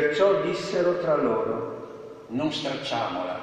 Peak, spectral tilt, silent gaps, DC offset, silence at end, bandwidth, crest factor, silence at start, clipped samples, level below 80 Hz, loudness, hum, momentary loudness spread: -10 dBFS; -5.5 dB/octave; none; under 0.1%; 0 s; 9.8 kHz; 16 dB; 0 s; under 0.1%; -62 dBFS; -26 LUFS; none; 14 LU